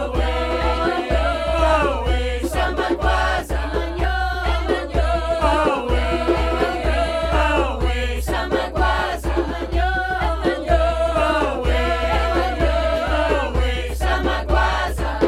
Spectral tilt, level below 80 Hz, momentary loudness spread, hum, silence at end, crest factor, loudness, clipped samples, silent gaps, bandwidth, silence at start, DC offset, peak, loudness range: -6 dB/octave; -24 dBFS; 4 LU; none; 0 s; 16 dB; -20 LUFS; under 0.1%; none; 13.5 kHz; 0 s; under 0.1%; -4 dBFS; 1 LU